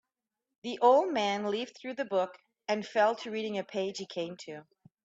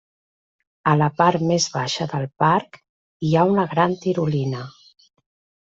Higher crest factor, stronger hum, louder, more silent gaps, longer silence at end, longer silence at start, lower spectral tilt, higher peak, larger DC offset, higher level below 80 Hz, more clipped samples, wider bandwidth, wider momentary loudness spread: about the same, 22 dB vs 18 dB; neither; second, -31 LUFS vs -20 LUFS; second, none vs 2.89-3.20 s; second, 0.4 s vs 0.95 s; second, 0.65 s vs 0.85 s; about the same, -4.5 dB/octave vs -5.5 dB/octave; second, -10 dBFS vs -4 dBFS; neither; second, -82 dBFS vs -58 dBFS; neither; about the same, 8 kHz vs 8 kHz; first, 18 LU vs 9 LU